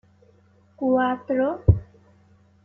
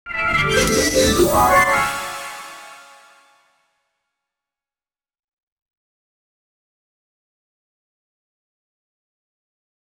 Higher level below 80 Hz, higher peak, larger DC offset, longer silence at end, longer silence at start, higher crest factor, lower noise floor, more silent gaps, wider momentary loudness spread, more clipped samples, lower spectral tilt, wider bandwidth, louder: about the same, -38 dBFS vs -40 dBFS; about the same, -4 dBFS vs -4 dBFS; neither; second, 0.8 s vs 7.2 s; first, 0.8 s vs 0.05 s; about the same, 22 dB vs 20 dB; second, -57 dBFS vs under -90 dBFS; neither; second, 4 LU vs 19 LU; neither; first, -11 dB/octave vs -3 dB/octave; second, 3.3 kHz vs over 20 kHz; second, -23 LUFS vs -16 LUFS